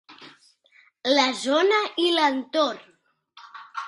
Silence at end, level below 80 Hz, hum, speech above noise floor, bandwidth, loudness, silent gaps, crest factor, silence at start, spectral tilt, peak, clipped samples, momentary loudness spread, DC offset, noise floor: 0 s; -78 dBFS; none; 37 dB; 11.5 kHz; -22 LUFS; none; 20 dB; 0.1 s; -1.5 dB/octave; -4 dBFS; under 0.1%; 16 LU; under 0.1%; -59 dBFS